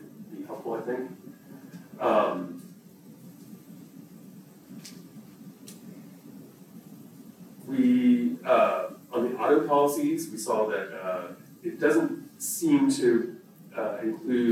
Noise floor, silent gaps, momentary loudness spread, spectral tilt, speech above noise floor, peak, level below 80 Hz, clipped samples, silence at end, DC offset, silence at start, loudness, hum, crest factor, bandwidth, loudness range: -50 dBFS; none; 25 LU; -5 dB/octave; 24 dB; -10 dBFS; -80 dBFS; under 0.1%; 0 s; under 0.1%; 0 s; -26 LUFS; none; 18 dB; 16.5 kHz; 22 LU